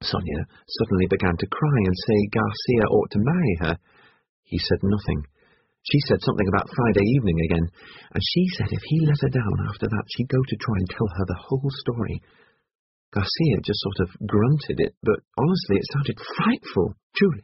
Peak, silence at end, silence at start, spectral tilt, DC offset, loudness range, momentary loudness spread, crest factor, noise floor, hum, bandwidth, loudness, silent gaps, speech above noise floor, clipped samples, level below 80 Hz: -4 dBFS; 0.05 s; 0 s; -6 dB/octave; under 0.1%; 4 LU; 7 LU; 20 dB; -63 dBFS; none; 6 kHz; -23 LUFS; 4.29-4.43 s, 12.75-13.12 s, 14.97-15.01 s, 17.03-17.10 s; 40 dB; under 0.1%; -44 dBFS